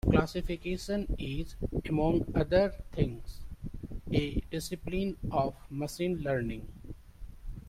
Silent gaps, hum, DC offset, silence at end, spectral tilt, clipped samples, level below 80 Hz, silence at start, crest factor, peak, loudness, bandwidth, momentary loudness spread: none; none; under 0.1%; 0 s; -7 dB/octave; under 0.1%; -42 dBFS; 0.05 s; 22 dB; -10 dBFS; -33 LUFS; 16 kHz; 19 LU